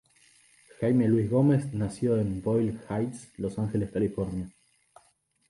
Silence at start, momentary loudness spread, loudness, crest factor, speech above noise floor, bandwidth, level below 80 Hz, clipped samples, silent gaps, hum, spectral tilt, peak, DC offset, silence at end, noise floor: 0.8 s; 11 LU; -28 LUFS; 16 dB; 41 dB; 11.5 kHz; -54 dBFS; under 0.1%; none; none; -8.5 dB/octave; -12 dBFS; under 0.1%; 1 s; -68 dBFS